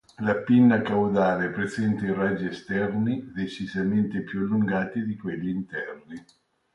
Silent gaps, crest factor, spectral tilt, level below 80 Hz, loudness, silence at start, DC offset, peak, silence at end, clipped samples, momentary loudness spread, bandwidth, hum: none; 16 dB; -8 dB/octave; -58 dBFS; -25 LUFS; 0.2 s; under 0.1%; -10 dBFS; 0.55 s; under 0.1%; 13 LU; 9.2 kHz; none